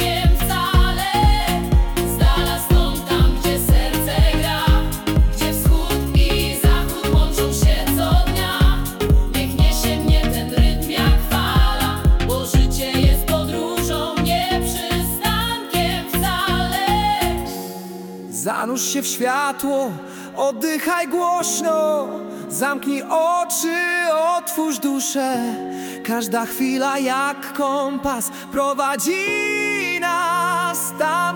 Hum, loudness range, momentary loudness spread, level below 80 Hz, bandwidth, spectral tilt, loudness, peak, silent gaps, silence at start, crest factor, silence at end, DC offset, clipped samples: none; 3 LU; 5 LU; -22 dBFS; 18 kHz; -4.5 dB/octave; -19 LUFS; -6 dBFS; none; 0 s; 12 dB; 0 s; under 0.1%; under 0.1%